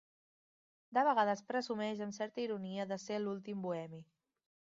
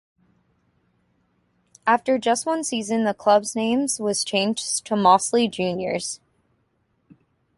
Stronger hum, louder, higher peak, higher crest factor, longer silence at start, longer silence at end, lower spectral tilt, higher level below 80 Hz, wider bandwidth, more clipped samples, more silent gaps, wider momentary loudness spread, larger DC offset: neither; second, -38 LUFS vs -22 LUFS; second, -20 dBFS vs -4 dBFS; about the same, 20 dB vs 20 dB; second, 0.9 s vs 1.85 s; second, 0.75 s vs 1.4 s; about the same, -4 dB/octave vs -3.5 dB/octave; second, -86 dBFS vs -66 dBFS; second, 7.4 kHz vs 11.5 kHz; neither; neither; about the same, 10 LU vs 9 LU; neither